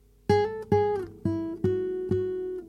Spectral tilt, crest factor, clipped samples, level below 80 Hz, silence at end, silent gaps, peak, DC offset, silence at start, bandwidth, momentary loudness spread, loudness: -8 dB/octave; 18 dB; under 0.1%; -54 dBFS; 0 s; none; -10 dBFS; under 0.1%; 0.3 s; 10 kHz; 6 LU; -28 LUFS